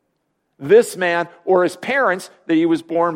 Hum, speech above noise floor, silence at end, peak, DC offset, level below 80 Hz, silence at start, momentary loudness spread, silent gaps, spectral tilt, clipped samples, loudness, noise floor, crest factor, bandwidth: none; 53 dB; 0 s; -2 dBFS; under 0.1%; -68 dBFS; 0.6 s; 7 LU; none; -5 dB/octave; under 0.1%; -17 LUFS; -70 dBFS; 16 dB; 16 kHz